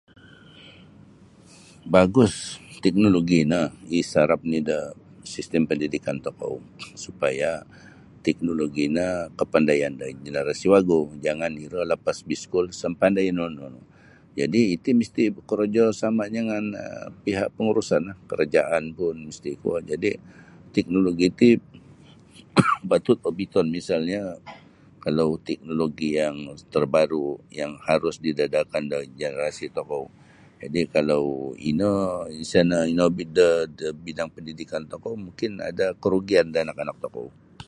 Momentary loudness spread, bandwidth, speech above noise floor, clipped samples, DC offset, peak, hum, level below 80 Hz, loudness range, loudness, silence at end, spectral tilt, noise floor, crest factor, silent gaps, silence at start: 14 LU; 11.5 kHz; 27 dB; under 0.1%; under 0.1%; -2 dBFS; none; -54 dBFS; 5 LU; -24 LUFS; 0.05 s; -6 dB/octave; -51 dBFS; 22 dB; none; 0.55 s